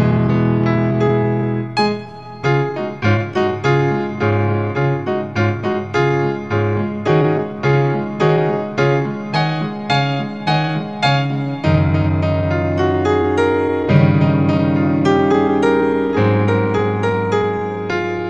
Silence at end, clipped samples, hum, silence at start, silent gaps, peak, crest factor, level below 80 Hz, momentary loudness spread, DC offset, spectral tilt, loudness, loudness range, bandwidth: 0 s; under 0.1%; none; 0 s; none; 0 dBFS; 16 dB; -44 dBFS; 5 LU; 0.5%; -8 dB/octave; -17 LUFS; 3 LU; 8.4 kHz